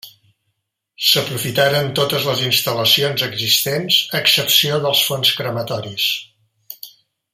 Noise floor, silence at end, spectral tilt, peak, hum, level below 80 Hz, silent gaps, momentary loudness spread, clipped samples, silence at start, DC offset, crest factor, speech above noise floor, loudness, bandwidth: -73 dBFS; 0.45 s; -2.5 dB/octave; 0 dBFS; none; -60 dBFS; none; 9 LU; under 0.1%; 0.05 s; under 0.1%; 18 dB; 55 dB; -16 LUFS; 16 kHz